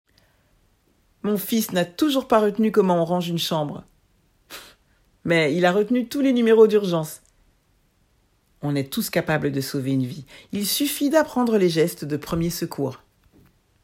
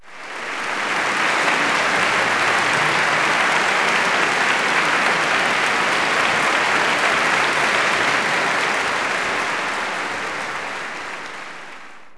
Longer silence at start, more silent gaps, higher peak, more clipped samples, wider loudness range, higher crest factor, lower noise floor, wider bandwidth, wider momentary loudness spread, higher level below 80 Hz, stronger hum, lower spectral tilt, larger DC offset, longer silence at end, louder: first, 1.25 s vs 0 s; neither; about the same, -4 dBFS vs -4 dBFS; neither; about the same, 5 LU vs 5 LU; about the same, 18 dB vs 16 dB; first, -63 dBFS vs -40 dBFS; first, 16.5 kHz vs 11 kHz; first, 14 LU vs 11 LU; about the same, -56 dBFS vs -60 dBFS; neither; first, -5 dB/octave vs -2 dB/octave; neither; first, 0.9 s vs 0 s; second, -22 LUFS vs -18 LUFS